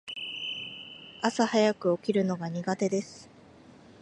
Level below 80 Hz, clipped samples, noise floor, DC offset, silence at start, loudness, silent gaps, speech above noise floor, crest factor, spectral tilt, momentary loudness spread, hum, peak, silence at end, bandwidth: -72 dBFS; under 0.1%; -53 dBFS; under 0.1%; 0.05 s; -29 LUFS; none; 26 dB; 22 dB; -5 dB/octave; 17 LU; none; -8 dBFS; 0.1 s; 10.5 kHz